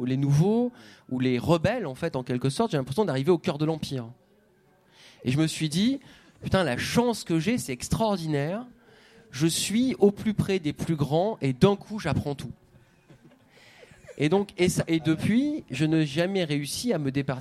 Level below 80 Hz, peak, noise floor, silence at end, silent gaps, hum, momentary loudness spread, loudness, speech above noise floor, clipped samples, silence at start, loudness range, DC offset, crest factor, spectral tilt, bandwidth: -54 dBFS; -4 dBFS; -62 dBFS; 0 s; none; none; 9 LU; -26 LUFS; 36 dB; under 0.1%; 0 s; 4 LU; under 0.1%; 22 dB; -6 dB/octave; 15 kHz